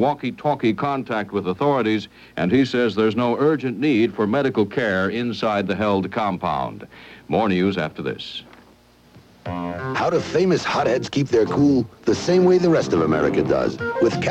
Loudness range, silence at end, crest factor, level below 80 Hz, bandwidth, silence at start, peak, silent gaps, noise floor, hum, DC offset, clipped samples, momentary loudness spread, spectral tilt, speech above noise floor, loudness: 6 LU; 0 s; 14 dB; -52 dBFS; 8.8 kHz; 0 s; -6 dBFS; none; -52 dBFS; none; under 0.1%; under 0.1%; 10 LU; -6.5 dB/octave; 32 dB; -21 LUFS